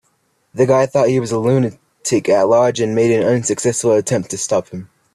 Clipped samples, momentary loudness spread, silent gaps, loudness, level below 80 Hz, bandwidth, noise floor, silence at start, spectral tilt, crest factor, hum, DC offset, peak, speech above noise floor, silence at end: under 0.1%; 8 LU; none; -16 LUFS; -56 dBFS; 13.5 kHz; -63 dBFS; 0.55 s; -5.5 dB/octave; 14 dB; none; under 0.1%; -2 dBFS; 48 dB; 0.3 s